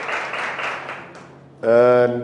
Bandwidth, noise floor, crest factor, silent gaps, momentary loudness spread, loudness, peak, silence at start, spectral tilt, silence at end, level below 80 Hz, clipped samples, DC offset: 10 kHz; -42 dBFS; 16 dB; none; 20 LU; -19 LUFS; -4 dBFS; 0 s; -6 dB/octave; 0 s; -68 dBFS; under 0.1%; under 0.1%